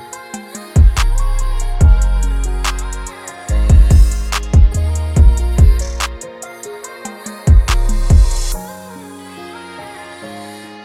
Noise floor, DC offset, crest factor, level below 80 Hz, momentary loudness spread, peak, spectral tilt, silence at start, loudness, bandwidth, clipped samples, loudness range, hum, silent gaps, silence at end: -32 dBFS; under 0.1%; 12 dB; -14 dBFS; 18 LU; 0 dBFS; -5.5 dB/octave; 0 s; -15 LUFS; 14 kHz; under 0.1%; 4 LU; none; none; 0 s